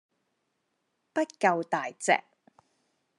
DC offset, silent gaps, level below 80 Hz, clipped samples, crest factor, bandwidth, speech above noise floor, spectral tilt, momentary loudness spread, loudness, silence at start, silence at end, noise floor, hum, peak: under 0.1%; none; under -90 dBFS; under 0.1%; 24 dB; 11.5 kHz; 51 dB; -3.5 dB/octave; 6 LU; -28 LUFS; 1.15 s; 1 s; -78 dBFS; none; -10 dBFS